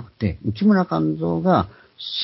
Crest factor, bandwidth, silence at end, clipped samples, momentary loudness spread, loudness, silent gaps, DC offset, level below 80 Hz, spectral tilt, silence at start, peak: 18 dB; 5.8 kHz; 0 s; under 0.1%; 11 LU; -21 LUFS; none; under 0.1%; -42 dBFS; -11 dB/octave; 0 s; -4 dBFS